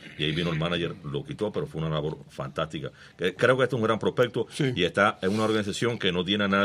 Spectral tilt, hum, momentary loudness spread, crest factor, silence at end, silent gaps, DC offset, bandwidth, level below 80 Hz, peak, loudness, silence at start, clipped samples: -5.5 dB/octave; none; 11 LU; 20 dB; 0 s; none; under 0.1%; 14.5 kHz; -56 dBFS; -6 dBFS; -27 LUFS; 0 s; under 0.1%